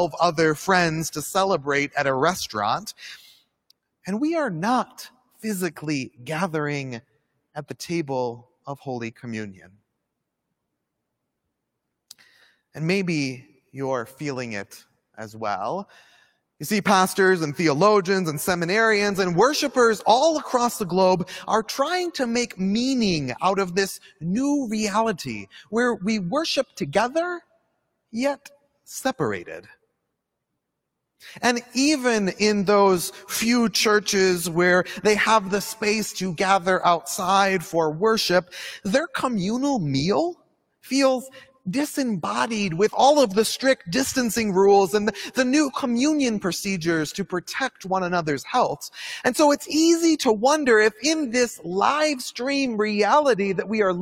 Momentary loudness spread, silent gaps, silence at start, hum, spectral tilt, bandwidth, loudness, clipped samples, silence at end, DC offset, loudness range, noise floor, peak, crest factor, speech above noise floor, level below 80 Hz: 14 LU; none; 0 s; none; -4 dB/octave; 17 kHz; -22 LUFS; under 0.1%; 0 s; under 0.1%; 11 LU; -80 dBFS; -4 dBFS; 18 dB; 58 dB; -60 dBFS